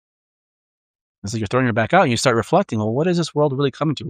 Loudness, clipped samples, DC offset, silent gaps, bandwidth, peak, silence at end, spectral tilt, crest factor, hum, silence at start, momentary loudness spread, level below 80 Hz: -19 LUFS; under 0.1%; under 0.1%; none; 15 kHz; -2 dBFS; 0 s; -5.5 dB/octave; 18 dB; none; 1.25 s; 7 LU; -56 dBFS